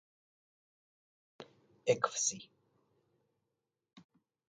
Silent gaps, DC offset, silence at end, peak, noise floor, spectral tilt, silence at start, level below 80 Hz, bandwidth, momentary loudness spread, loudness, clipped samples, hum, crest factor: none; under 0.1%; 0.5 s; -16 dBFS; -88 dBFS; -2 dB/octave; 1.4 s; -84 dBFS; 9.4 kHz; 24 LU; -34 LUFS; under 0.1%; none; 26 dB